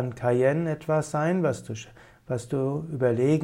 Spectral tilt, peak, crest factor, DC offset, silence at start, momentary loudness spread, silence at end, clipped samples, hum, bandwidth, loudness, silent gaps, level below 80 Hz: -7.5 dB/octave; -10 dBFS; 16 dB; under 0.1%; 0 s; 12 LU; 0 s; under 0.1%; none; 13 kHz; -26 LUFS; none; -60 dBFS